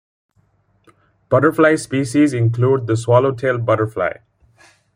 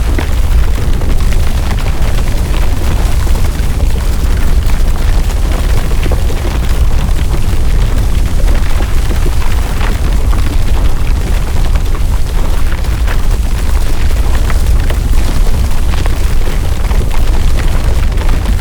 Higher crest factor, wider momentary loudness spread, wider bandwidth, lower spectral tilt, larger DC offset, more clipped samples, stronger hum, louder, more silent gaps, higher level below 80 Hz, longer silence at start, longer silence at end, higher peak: first, 16 dB vs 8 dB; first, 6 LU vs 2 LU; second, 15 kHz vs 18.5 kHz; first, -7 dB/octave vs -5.5 dB/octave; neither; neither; neither; about the same, -16 LUFS vs -15 LUFS; neither; second, -56 dBFS vs -10 dBFS; first, 1.3 s vs 0 s; first, 0.8 s vs 0 s; about the same, -2 dBFS vs 0 dBFS